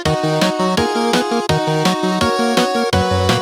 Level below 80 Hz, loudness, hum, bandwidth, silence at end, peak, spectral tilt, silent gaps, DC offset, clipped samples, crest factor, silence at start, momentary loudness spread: -42 dBFS; -16 LUFS; none; 17 kHz; 0 s; -4 dBFS; -5 dB/octave; none; under 0.1%; under 0.1%; 12 dB; 0 s; 2 LU